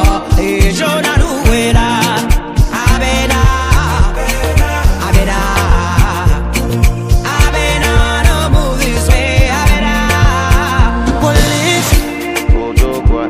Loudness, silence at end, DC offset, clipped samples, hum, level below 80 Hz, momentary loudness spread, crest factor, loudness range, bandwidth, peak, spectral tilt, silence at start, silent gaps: -12 LUFS; 0 s; under 0.1%; 0.2%; none; -14 dBFS; 3 LU; 10 dB; 1 LU; 16 kHz; 0 dBFS; -5 dB/octave; 0 s; none